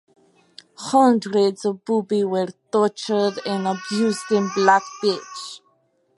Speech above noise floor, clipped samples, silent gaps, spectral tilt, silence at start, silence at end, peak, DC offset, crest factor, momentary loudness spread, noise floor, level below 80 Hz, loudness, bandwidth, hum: 44 dB; under 0.1%; none; -5 dB/octave; 0.8 s; 0.6 s; -2 dBFS; under 0.1%; 20 dB; 12 LU; -64 dBFS; -74 dBFS; -21 LUFS; 11.5 kHz; none